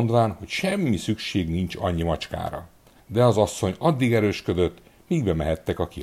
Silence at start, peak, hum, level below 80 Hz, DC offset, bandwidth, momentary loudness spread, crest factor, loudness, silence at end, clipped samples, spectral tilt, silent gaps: 0 s; -6 dBFS; none; -42 dBFS; under 0.1%; 15 kHz; 8 LU; 18 dB; -24 LUFS; 0 s; under 0.1%; -6.5 dB/octave; none